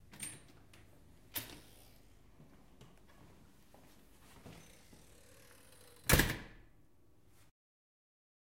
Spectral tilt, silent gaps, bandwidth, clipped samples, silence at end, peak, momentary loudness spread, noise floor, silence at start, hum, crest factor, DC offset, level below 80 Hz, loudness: -3.5 dB/octave; none; 16 kHz; under 0.1%; 2 s; -10 dBFS; 32 LU; -69 dBFS; 0.15 s; none; 34 dB; under 0.1%; -52 dBFS; -36 LUFS